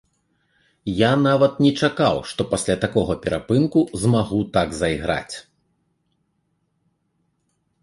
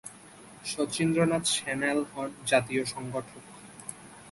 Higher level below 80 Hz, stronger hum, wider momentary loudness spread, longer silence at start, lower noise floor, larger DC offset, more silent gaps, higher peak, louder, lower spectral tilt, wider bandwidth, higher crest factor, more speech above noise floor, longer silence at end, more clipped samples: first, -46 dBFS vs -64 dBFS; neither; second, 9 LU vs 22 LU; first, 0.85 s vs 0.05 s; first, -70 dBFS vs -51 dBFS; neither; neither; first, -2 dBFS vs -10 dBFS; first, -20 LUFS vs -29 LUFS; first, -6 dB/octave vs -4 dB/octave; about the same, 11.5 kHz vs 12 kHz; about the same, 20 dB vs 22 dB; first, 51 dB vs 22 dB; first, 2.4 s vs 0 s; neither